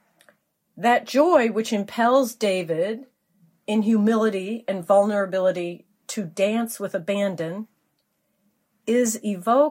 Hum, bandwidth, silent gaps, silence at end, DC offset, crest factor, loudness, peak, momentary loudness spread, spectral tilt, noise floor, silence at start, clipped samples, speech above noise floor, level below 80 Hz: none; 16 kHz; none; 0 s; under 0.1%; 18 dB; -22 LUFS; -4 dBFS; 13 LU; -5 dB/octave; -72 dBFS; 0.75 s; under 0.1%; 50 dB; -78 dBFS